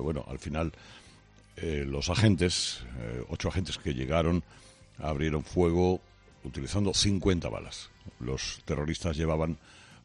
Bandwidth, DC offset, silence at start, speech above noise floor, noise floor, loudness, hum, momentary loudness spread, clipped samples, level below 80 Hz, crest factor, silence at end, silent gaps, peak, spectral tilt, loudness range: 10.5 kHz; under 0.1%; 0 s; 26 dB; -56 dBFS; -30 LUFS; none; 14 LU; under 0.1%; -44 dBFS; 20 dB; 0.05 s; none; -10 dBFS; -5 dB/octave; 2 LU